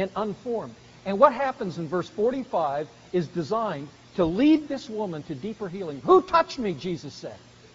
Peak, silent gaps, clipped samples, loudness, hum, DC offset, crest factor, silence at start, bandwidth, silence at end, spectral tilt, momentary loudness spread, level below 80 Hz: -4 dBFS; none; under 0.1%; -26 LUFS; none; under 0.1%; 22 dB; 0 s; 7.6 kHz; 0.35 s; -5.5 dB/octave; 15 LU; -58 dBFS